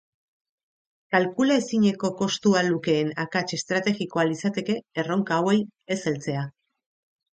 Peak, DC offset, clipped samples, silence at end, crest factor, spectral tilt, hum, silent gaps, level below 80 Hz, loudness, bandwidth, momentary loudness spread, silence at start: -4 dBFS; under 0.1%; under 0.1%; 0.9 s; 22 dB; -5 dB/octave; none; none; -68 dBFS; -25 LUFS; 9.2 kHz; 7 LU; 1.1 s